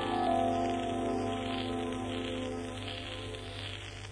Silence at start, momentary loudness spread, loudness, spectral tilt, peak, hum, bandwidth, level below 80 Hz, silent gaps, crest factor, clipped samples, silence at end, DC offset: 0 s; 10 LU; -35 LUFS; -5.5 dB/octave; -18 dBFS; none; 10.5 kHz; -52 dBFS; none; 16 dB; under 0.1%; 0 s; under 0.1%